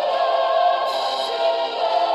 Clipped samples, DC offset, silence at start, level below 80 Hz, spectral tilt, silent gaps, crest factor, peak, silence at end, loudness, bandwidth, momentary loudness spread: under 0.1%; under 0.1%; 0 s; -70 dBFS; -1 dB/octave; none; 12 dB; -8 dBFS; 0 s; -20 LUFS; 12 kHz; 4 LU